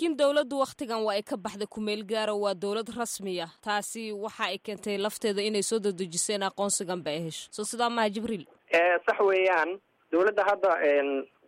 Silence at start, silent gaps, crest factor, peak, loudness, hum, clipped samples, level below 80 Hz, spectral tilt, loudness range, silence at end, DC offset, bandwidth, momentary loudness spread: 0 s; none; 16 dB; -12 dBFS; -28 LUFS; none; under 0.1%; -72 dBFS; -3 dB/octave; 6 LU; 0.25 s; under 0.1%; 16 kHz; 10 LU